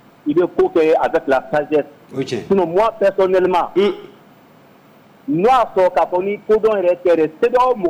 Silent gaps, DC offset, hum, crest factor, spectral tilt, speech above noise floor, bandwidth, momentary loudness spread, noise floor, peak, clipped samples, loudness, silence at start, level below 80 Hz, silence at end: none; under 0.1%; none; 10 dB; -6.5 dB/octave; 32 dB; 16 kHz; 8 LU; -47 dBFS; -8 dBFS; under 0.1%; -16 LUFS; 0.25 s; -50 dBFS; 0 s